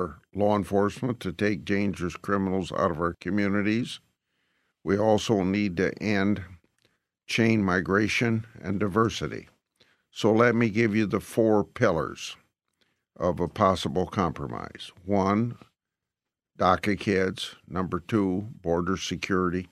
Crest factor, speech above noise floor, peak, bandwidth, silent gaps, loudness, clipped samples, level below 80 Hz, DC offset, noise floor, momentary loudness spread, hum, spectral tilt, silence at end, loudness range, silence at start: 22 dB; 63 dB; -6 dBFS; 13.5 kHz; none; -26 LUFS; under 0.1%; -58 dBFS; under 0.1%; -89 dBFS; 10 LU; none; -6 dB/octave; 0.05 s; 3 LU; 0 s